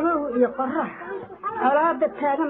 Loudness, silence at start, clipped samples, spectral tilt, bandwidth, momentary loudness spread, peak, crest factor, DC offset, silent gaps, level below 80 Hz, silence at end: -23 LUFS; 0 s; under 0.1%; -4 dB/octave; 4 kHz; 12 LU; -8 dBFS; 16 dB; under 0.1%; none; -62 dBFS; 0 s